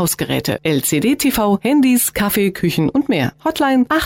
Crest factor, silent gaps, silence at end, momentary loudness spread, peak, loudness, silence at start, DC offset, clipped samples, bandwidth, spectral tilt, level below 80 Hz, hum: 10 dB; none; 0 s; 5 LU; -6 dBFS; -16 LUFS; 0 s; under 0.1%; under 0.1%; 17 kHz; -4.5 dB/octave; -44 dBFS; none